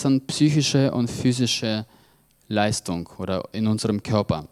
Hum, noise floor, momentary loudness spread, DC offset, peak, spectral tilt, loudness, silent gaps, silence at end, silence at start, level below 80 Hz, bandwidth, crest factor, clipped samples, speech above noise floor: none; -58 dBFS; 9 LU; under 0.1%; -6 dBFS; -5 dB/octave; -23 LUFS; none; 0.05 s; 0 s; -52 dBFS; 14.5 kHz; 18 dB; under 0.1%; 36 dB